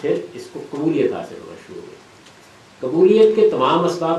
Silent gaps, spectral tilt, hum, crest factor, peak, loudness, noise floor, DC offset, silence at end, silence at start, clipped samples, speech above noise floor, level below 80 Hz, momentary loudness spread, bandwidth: none; -6.5 dB/octave; none; 16 dB; -2 dBFS; -17 LUFS; -46 dBFS; under 0.1%; 0 s; 0 s; under 0.1%; 29 dB; -64 dBFS; 24 LU; 11 kHz